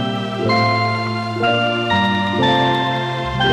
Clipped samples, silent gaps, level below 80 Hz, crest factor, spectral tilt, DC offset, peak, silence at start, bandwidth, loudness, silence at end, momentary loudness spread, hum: under 0.1%; none; -44 dBFS; 12 dB; -6 dB/octave; under 0.1%; -6 dBFS; 0 s; 11 kHz; -17 LUFS; 0 s; 6 LU; none